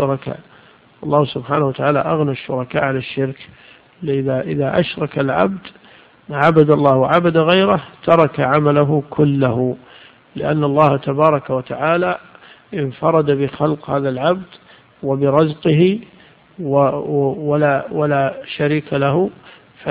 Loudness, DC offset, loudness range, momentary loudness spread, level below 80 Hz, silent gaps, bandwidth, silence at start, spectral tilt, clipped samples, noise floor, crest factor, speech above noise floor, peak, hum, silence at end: -17 LUFS; under 0.1%; 6 LU; 11 LU; -52 dBFS; none; 5 kHz; 0 s; -9.5 dB/octave; under 0.1%; -47 dBFS; 16 dB; 31 dB; 0 dBFS; none; 0 s